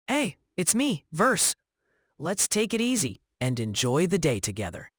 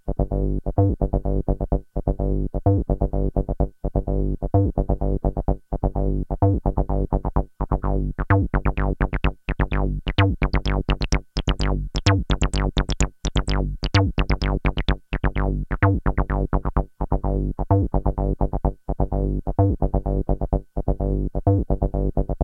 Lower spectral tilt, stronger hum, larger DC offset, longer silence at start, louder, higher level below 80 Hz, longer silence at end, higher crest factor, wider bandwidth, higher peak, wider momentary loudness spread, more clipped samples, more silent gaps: second, -3.5 dB/octave vs -7 dB/octave; neither; neither; about the same, 0.1 s vs 0.05 s; about the same, -26 LUFS vs -24 LUFS; second, -56 dBFS vs -24 dBFS; about the same, 0.1 s vs 0 s; about the same, 20 dB vs 20 dB; first, over 20 kHz vs 8.8 kHz; second, -6 dBFS vs -2 dBFS; first, 8 LU vs 5 LU; neither; neither